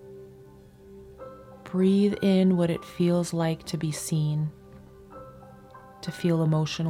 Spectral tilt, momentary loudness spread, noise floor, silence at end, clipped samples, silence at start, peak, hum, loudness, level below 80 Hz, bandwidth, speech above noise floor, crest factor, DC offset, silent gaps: -6.5 dB/octave; 24 LU; -50 dBFS; 0 s; under 0.1%; 0 s; -12 dBFS; none; -25 LUFS; -58 dBFS; 14.5 kHz; 26 dB; 14 dB; under 0.1%; none